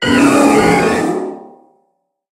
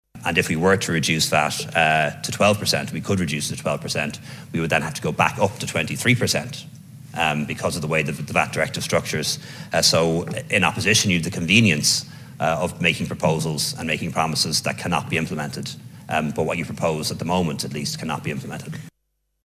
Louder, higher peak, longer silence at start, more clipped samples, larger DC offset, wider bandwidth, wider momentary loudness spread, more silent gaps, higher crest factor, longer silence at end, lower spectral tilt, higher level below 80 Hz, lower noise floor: first, -12 LUFS vs -21 LUFS; about the same, 0 dBFS vs 0 dBFS; second, 0 s vs 0.15 s; neither; neither; about the same, 16 kHz vs 16 kHz; about the same, 12 LU vs 11 LU; neither; second, 14 dB vs 22 dB; first, 0.85 s vs 0.6 s; about the same, -4.5 dB/octave vs -3.5 dB/octave; about the same, -44 dBFS vs -48 dBFS; second, -65 dBFS vs -73 dBFS